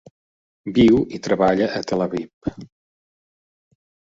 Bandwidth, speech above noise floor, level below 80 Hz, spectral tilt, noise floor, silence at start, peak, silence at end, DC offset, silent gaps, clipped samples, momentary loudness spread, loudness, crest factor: 7.8 kHz; over 71 dB; -50 dBFS; -6.5 dB/octave; under -90 dBFS; 0.65 s; -4 dBFS; 1.45 s; under 0.1%; 2.33-2.41 s; under 0.1%; 16 LU; -20 LUFS; 18 dB